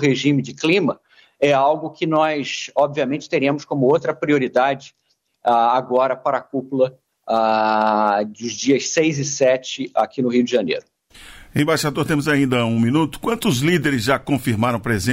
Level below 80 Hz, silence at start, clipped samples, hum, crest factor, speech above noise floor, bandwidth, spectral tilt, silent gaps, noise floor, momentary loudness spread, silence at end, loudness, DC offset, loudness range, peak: -54 dBFS; 0 s; under 0.1%; none; 14 dB; 25 dB; 16 kHz; -5 dB/octave; none; -43 dBFS; 6 LU; 0 s; -19 LUFS; under 0.1%; 1 LU; -4 dBFS